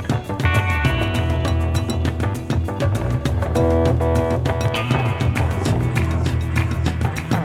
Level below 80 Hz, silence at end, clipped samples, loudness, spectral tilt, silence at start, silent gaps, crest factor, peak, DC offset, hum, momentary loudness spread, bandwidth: -28 dBFS; 0 s; under 0.1%; -20 LUFS; -6.5 dB/octave; 0 s; none; 16 dB; -4 dBFS; under 0.1%; none; 4 LU; 14.5 kHz